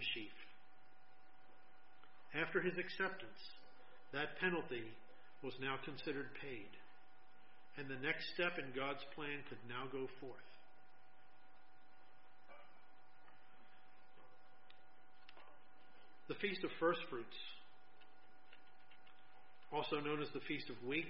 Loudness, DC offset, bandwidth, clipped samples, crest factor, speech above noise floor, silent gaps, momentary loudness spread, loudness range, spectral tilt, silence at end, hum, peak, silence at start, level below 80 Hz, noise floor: -44 LUFS; 0.3%; 5.6 kHz; under 0.1%; 24 dB; 25 dB; none; 27 LU; 22 LU; -2.5 dB/octave; 0 s; none; -24 dBFS; 0 s; -84 dBFS; -69 dBFS